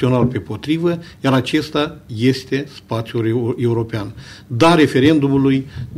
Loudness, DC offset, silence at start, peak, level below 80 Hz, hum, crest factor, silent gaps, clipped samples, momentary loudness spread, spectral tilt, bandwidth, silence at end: -17 LUFS; under 0.1%; 0 s; -2 dBFS; -46 dBFS; none; 14 dB; none; under 0.1%; 13 LU; -7 dB/octave; 14.5 kHz; 0 s